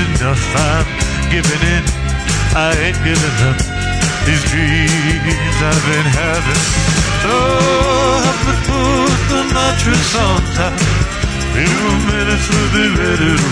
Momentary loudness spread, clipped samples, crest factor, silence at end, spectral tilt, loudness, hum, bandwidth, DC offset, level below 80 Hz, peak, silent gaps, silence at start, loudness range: 3 LU; under 0.1%; 12 dB; 0 s; -4.5 dB/octave; -13 LUFS; none; 11 kHz; under 0.1%; -22 dBFS; 0 dBFS; none; 0 s; 1 LU